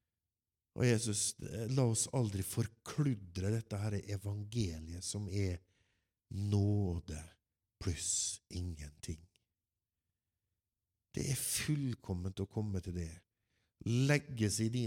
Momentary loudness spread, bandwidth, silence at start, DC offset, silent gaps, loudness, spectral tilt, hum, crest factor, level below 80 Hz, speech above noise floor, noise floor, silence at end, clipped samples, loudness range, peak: 14 LU; 17 kHz; 0.75 s; under 0.1%; none; -37 LUFS; -5 dB/octave; none; 22 dB; -58 dBFS; over 54 dB; under -90 dBFS; 0 s; under 0.1%; 6 LU; -16 dBFS